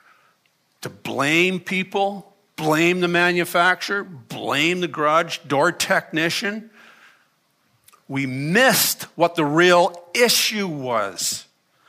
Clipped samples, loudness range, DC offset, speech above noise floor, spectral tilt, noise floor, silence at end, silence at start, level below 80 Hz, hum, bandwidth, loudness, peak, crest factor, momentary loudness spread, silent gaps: under 0.1%; 5 LU; under 0.1%; 45 dB; -3.5 dB/octave; -65 dBFS; 0.45 s; 0.8 s; -70 dBFS; none; 15.5 kHz; -19 LUFS; -2 dBFS; 18 dB; 14 LU; none